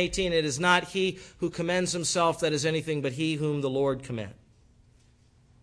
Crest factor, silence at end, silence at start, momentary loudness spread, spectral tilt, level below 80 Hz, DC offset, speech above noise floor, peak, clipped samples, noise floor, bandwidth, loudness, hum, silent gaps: 20 dB; 1.3 s; 0 s; 10 LU; -4 dB/octave; -54 dBFS; under 0.1%; 33 dB; -8 dBFS; under 0.1%; -60 dBFS; 11 kHz; -27 LUFS; none; none